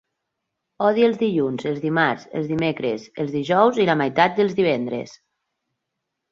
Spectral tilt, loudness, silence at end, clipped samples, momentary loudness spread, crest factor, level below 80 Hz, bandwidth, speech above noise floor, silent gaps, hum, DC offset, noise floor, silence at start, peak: -6.5 dB/octave; -21 LUFS; 1.15 s; under 0.1%; 9 LU; 20 dB; -62 dBFS; 7.4 kHz; 60 dB; none; none; under 0.1%; -80 dBFS; 0.8 s; -2 dBFS